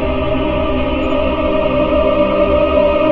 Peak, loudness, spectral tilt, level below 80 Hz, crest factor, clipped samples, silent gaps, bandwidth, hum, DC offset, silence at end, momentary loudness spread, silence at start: -2 dBFS; -15 LUFS; -9 dB/octave; -26 dBFS; 12 dB; under 0.1%; none; 5.2 kHz; none; under 0.1%; 0 s; 4 LU; 0 s